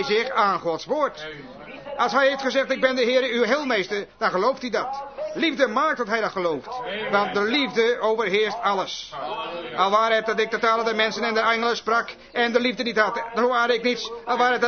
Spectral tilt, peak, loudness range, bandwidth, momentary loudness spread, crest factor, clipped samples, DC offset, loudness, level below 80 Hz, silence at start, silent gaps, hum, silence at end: -3.5 dB/octave; -4 dBFS; 2 LU; 6.6 kHz; 10 LU; 18 dB; under 0.1%; under 0.1%; -22 LUFS; -62 dBFS; 0 s; none; none; 0 s